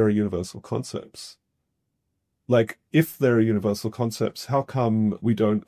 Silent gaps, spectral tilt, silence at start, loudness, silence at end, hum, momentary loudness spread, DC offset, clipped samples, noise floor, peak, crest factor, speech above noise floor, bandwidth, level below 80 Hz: none; -7 dB/octave; 0 s; -24 LUFS; 0.05 s; none; 13 LU; under 0.1%; under 0.1%; -77 dBFS; -6 dBFS; 18 dB; 54 dB; 16 kHz; -54 dBFS